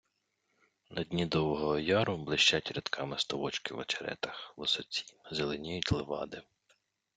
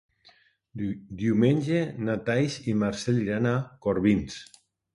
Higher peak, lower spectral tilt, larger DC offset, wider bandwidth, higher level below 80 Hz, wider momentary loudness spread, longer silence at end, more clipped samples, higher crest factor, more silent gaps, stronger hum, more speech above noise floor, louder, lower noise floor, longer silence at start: about the same, -12 dBFS vs -10 dBFS; second, -4 dB/octave vs -7 dB/octave; neither; second, 9.4 kHz vs 11.5 kHz; second, -60 dBFS vs -54 dBFS; about the same, 13 LU vs 11 LU; first, 0.75 s vs 0.5 s; neither; about the same, 22 dB vs 18 dB; neither; neither; first, 46 dB vs 35 dB; second, -33 LUFS vs -27 LUFS; first, -80 dBFS vs -60 dBFS; first, 0.9 s vs 0.75 s